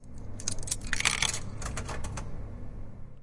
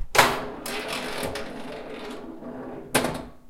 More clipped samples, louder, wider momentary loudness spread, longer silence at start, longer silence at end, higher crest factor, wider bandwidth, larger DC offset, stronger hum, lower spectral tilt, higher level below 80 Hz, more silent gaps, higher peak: neither; second, -32 LUFS vs -28 LUFS; first, 19 LU vs 16 LU; about the same, 0 s vs 0 s; about the same, 0 s vs 0 s; about the same, 26 dB vs 28 dB; second, 11.5 kHz vs 16.5 kHz; neither; neither; about the same, -2 dB/octave vs -2.5 dB/octave; first, -40 dBFS vs -48 dBFS; neither; second, -6 dBFS vs 0 dBFS